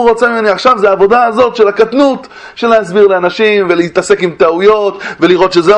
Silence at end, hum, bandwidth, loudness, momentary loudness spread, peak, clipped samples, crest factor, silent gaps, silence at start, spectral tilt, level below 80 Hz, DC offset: 0 s; none; 10.5 kHz; -9 LUFS; 4 LU; 0 dBFS; 0.7%; 8 dB; none; 0 s; -5 dB/octave; -46 dBFS; under 0.1%